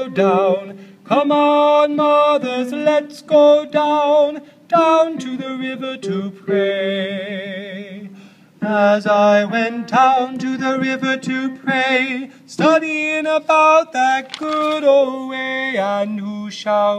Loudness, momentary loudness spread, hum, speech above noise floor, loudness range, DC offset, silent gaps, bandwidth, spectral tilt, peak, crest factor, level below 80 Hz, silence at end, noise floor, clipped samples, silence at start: -16 LUFS; 12 LU; none; 27 dB; 5 LU; under 0.1%; none; 10.5 kHz; -5 dB/octave; -2 dBFS; 14 dB; -72 dBFS; 0 s; -43 dBFS; under 0.1%; 0 s